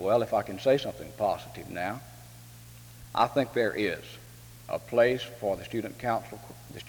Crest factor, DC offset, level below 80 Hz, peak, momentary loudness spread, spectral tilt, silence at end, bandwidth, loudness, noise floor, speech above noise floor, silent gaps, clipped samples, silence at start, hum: 20 dB; under 0.1%; -58 dBFS; -10 dBFS; 22 LU; -5.5 dB/octave; 0 s; over 20 kHz; -29 LUFS; -49 dBFS; 19 dB; none; under 0.1%; 0 s; none